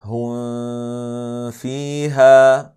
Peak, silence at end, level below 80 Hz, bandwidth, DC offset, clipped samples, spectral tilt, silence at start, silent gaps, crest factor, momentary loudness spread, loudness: 0 dBFS; 0.1 s; -68 dBFS; 12.5 kHz; under 0.1%; under 0.1%; -6 dB/octave; 0.05 s; none; 16 dB; 17 LU; -16 LUFS